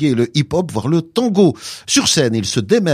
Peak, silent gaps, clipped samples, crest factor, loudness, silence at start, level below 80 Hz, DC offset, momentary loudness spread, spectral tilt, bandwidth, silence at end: -2 dBFS; none; under 0.1%; 14 dB; -16 LUFS; 0 s; -50 dBFS; under 0.1%; 6 LU; -4.5 dB/octave; 15.5 kHz; 0 s